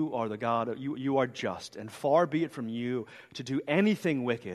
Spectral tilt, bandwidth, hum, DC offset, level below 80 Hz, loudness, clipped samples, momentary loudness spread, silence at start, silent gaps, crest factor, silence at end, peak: -6.5 dB/octave; 13 kHz; none; under 0.1%; -74 dBFS; -30 LUFS; under 0.1%; 11 LU; 0 s; none; 18 dB; 0 s; -12 dBFS